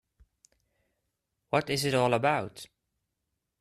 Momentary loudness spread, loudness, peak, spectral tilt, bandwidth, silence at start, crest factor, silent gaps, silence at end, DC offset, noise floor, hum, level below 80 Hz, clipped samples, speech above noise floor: 20 LU; -28 LUFS; -10 dBFS; -4.5 dB/octave; 14 kHz; 1.55 s; 22 dB; none; 0.95 s; under 0.1%; -83 dBFS; none; -66 dBFS; under 0.1%; 56 dB